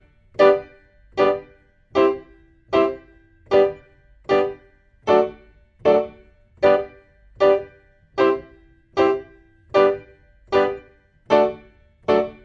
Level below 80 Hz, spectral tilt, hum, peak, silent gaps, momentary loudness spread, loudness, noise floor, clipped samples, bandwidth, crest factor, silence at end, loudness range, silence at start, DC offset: -54 dBFS; -6 dB/octave; none; -2 dBFS; none; 14 LU; -20 LUFS; -53 dBFS; under 0.1%; 7.2 kHz; 20 dB; 0.15 s; 1 LU; 0.4 s; under 0.1%